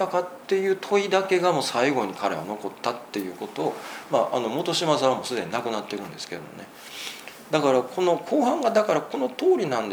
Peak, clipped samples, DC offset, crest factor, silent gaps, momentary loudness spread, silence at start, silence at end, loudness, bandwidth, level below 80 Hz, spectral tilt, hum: -4 dBFS; under 0.1%; under 0.1%; 20 dB; none; 13 LU; 0 s; 0 s; -25 LUFS; over 20 kHz; -74 dBFS; -4.5 dB/octave; none